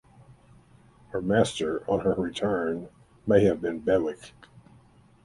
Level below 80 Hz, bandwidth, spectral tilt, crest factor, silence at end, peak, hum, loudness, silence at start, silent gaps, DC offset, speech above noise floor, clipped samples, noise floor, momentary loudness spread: -54 dBFS; 11.5 kHz; -6 dB/octave; 22 dB; 0.95 s; -6 dBFS; none; -26 LUFS; 0.3 s; none; under 0.1%; 31 dB; under 0.1%; -57 dBFS; 14 LU